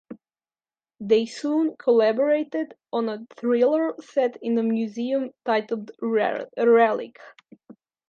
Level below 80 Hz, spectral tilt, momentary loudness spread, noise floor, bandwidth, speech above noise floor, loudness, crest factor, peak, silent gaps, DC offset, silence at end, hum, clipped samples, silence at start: -78 dBFS; -6 dB/octave; 10 LU; under -90 dBFS; 8.6 kHz; over 67 dB; -23 LUFS; 18 dB; -6 dBFS; none; under 0.1%; 0.35 s; none; under 0.1%; 0.1 s